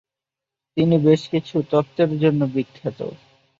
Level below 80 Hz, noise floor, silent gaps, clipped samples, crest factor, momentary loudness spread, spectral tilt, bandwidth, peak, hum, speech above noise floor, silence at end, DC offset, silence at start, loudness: -60 dBFS; -87 dBFS; none; under 0.1%; 18 dB; 13 LU; -8.5 dB/octave; 7.6 kHz; -4 dBFS; none; 68 dB; 0.45 s; under 0.1%; 0.75 s; -20 LUFS